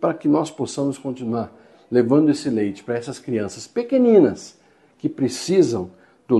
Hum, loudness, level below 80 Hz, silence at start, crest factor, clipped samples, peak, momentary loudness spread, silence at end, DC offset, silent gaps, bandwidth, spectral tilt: none; -21 LUFS; -62 dBFS; 0 s; 18 dB; under 0.1%; -2 dBFS; 13 LU; 0 s; under 0.1%; none; 12 kHz; -6.5 dB/octave